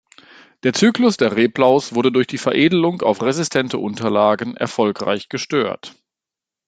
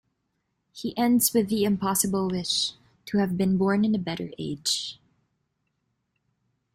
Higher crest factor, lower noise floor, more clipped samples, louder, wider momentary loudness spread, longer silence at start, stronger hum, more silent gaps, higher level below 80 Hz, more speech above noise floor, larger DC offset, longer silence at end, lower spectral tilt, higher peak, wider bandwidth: about the same, 16 dB vs 20 dB; first, -87 dBFS vs -77 dBFS; neither; first, -18 LUFS vs -25 LUFS; second, 8 LU vs 11 LU; about the same, 0.65 s vs 0.75 s; neither; neither; about the same, -62 dBFS vs -60 dBFS; first, 70 dB vs 52 dB; neither; second, 0.8 s vs 1.8 s; about the same, -5 dB/octave vs -4 dB/octave; first, -2 dBFS vs -8 dBFS; second, 9.4 kHz vs 16 kHz